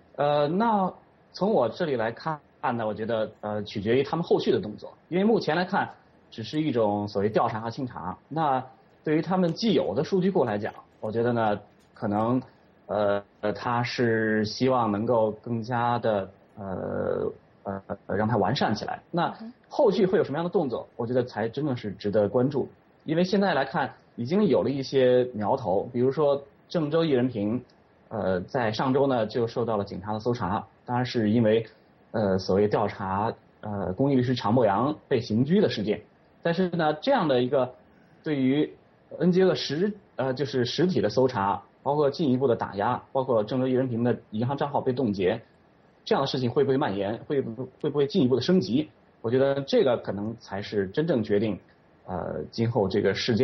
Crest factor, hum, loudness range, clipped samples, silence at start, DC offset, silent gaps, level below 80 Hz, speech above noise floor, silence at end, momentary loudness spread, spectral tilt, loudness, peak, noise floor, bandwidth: 16 dB; none; 3 LU; under 0.1%; 0.2 s; under 0.1%; none; -62 dBFS; 34 dB; 0 s; 10 LU; -7.5 dB/octave; -26 LUFS; -10 dBFS; -59 dBFS; 6.4 kHz